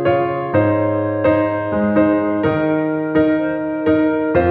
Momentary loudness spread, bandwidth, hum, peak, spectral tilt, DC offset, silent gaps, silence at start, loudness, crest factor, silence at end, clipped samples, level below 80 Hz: 3 LU; 4.4 kHz; none; -2 dBFS; -11 dB/octave; under 0.1%; none; 0 s; -17 LUFS; 14 dB; 0 s; under 0.1%; -46 dBFS